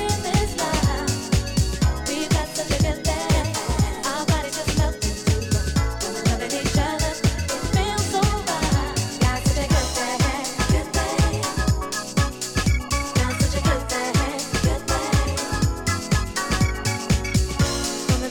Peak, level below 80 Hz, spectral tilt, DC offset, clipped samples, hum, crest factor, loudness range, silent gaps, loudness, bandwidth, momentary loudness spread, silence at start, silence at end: -12 dBFS; -28 dBFS; -4.5 dB/octave; under 0.1%; under 0.1%; none; 10 dB; 1 LU; none; -23 LUFS; 19 kHz; 3 LU; 0 s; 0 s